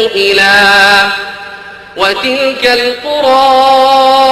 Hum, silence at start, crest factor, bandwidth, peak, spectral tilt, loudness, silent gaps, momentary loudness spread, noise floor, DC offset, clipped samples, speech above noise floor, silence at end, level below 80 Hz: none; 0 s; 8 dB; 13.5 kHz; 0 dBFS; -2 dB/octave; -7 LUFS; none; 18 LU; -28 dBFS; under 0.1%; 0.2%; 20 dB; 0 s; -44 dBFS